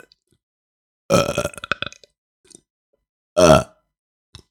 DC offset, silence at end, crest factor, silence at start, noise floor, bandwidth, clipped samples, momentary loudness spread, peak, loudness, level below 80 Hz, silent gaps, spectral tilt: under 0.1%; 0.85 s; 22 dB; 1.1 s; under -90 dBFS; 17.5 kHz; under 0.1%; 15 LU; 0 dBFS; -18 LUFS; -44 dBFS; 2.18-2.44 s, 2.70-2.93 s, 3.09-3.36 s; -4.5 dB/octave